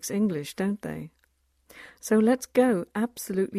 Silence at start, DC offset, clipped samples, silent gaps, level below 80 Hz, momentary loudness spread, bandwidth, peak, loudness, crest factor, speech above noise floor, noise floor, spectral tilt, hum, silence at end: 0 s; under 0.1%; under 0.1%; none; -64 dBFS; 16 LU; 15.5 kHz; -10 dBFS; -26 LUFS; 18 dB; 43 dB; -69 dBFS; -5.5 dB/octave; none; 0 s